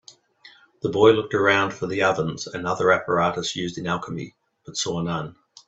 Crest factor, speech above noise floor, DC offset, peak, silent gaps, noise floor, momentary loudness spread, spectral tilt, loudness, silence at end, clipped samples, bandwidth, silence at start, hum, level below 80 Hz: 20 dB; 30 dB; under 0.1%; -2 dBFS; none; -52 dBFS; 14 LU; -4.5 dB/octave; -22 LUFS; 0.35 s; under 0.1%; 8.2 kHz; 0.45 s; none; -58 dBFS